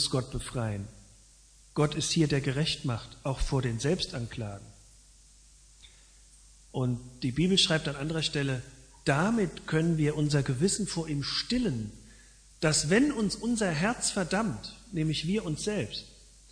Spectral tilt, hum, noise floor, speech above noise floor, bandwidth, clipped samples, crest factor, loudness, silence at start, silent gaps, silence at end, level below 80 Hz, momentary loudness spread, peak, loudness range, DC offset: -4.5 dB/octave; none; -57 dBFS; 28 dB; 10.5 kHz; under 0.1%; 20 dB; -29 LUFS; 0 s; none; 0.4 s; -48 dBFS; 12 LU; -10 dBFS; 7 LU; under 0.1%